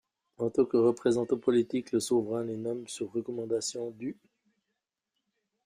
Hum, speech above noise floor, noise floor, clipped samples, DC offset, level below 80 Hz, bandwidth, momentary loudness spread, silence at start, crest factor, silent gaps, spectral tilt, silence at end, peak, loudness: none; 56 dB; -85 dBFS; under 0.1%; under 0.1%; -72 dBFS; 15 kHz; 11 LU; 0.4 s; 18 dB; none; -5.5 dB/octave; 1.55 s; -14 dBFS; -30 LUFS